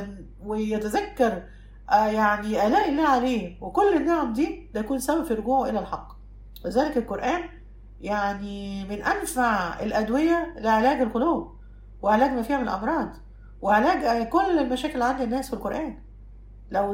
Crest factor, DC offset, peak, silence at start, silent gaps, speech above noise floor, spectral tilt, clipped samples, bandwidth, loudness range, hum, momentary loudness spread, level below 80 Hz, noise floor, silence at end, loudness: 18 dB; under 0.1%; -6 dBFS; 0 s; none; 20 dB; -5 dB/octave; under 0.1%; 16 kHz; 4 LU; none; 11 LU; -44 dBFS; -44 dBFS; 0 s; -25 LUFS